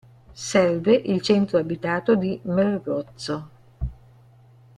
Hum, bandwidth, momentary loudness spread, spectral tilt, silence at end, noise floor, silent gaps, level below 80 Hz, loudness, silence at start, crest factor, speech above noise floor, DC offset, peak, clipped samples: none; 11 kHz; 15 LU; -6 dB/octave; 0.85 s; -52 dBFS; none; -44 dBFS; -22 LUFS; 0.3 s; 18 dB; 30 dB; under 0.1%; -6 dBFS; under 0.1%